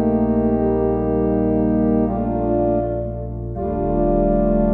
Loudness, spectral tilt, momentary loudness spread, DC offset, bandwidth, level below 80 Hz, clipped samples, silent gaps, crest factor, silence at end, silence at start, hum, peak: -19 LUFS; -13.5 dB/octave; 8 LU; under 0.1%; 2.9 kHz; -30 dBFS; under 0.1%; none; 12 dB; 0 s; 0 s; none; -6 dBFS